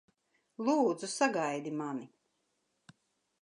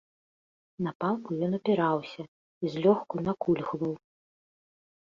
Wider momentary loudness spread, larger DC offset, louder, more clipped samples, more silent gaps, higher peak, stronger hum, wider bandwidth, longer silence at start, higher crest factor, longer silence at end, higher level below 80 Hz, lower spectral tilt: about the same, 12 LU vs 14 LU; neither; second, -33 LUFS vs -29 LUFS; neither; second, none vs 0.95-1.00 s, 2.28-2.61 s; second, -14 dBFS vs -10 dBFS; neither; first, 11.5 kHz vs 7.4 kHz; second, 0.6 s vs 0.8 s; about the same, 22 dB vs 20 dB; first, 1.35 s vs 1.1 s; second, -88 dBFS vs -68 dBFS; second, -4 dB/octave vs -8.5 dB/octave